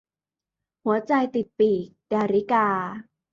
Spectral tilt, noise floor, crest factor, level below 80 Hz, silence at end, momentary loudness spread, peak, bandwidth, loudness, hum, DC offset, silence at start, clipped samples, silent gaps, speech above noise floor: -7.5 dB/octave; under -90 dBFS; 16 dB; -68 dBFS; 0.3 s; 9 LU; -10 dBFS; 7.2 kHz; -24 LUFS; none; under 0.1%; 0.85 s; under 0.1%; none; over 67 dB